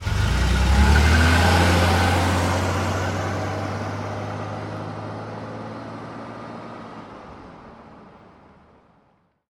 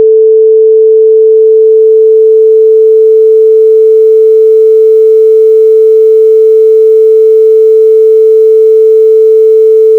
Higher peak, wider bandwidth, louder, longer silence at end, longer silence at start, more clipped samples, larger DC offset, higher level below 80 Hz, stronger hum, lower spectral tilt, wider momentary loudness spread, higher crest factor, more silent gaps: second, -4 dBFS vs 0 dBFS; first, 15.5 kHz vs 1.4 kHz; second, -21 LUFS vs -4 LUFS; first, 1.45 s vs 0 s; about the same, 0 s vs 0 s; neither; neither; first, -28 dBFS vs -74 dBFS; neither; about the same, -5.5 dB/octave vs -5 dB/octave; first, 21 LU vs 0 LU; first, 18 dB vs 4 dB; neither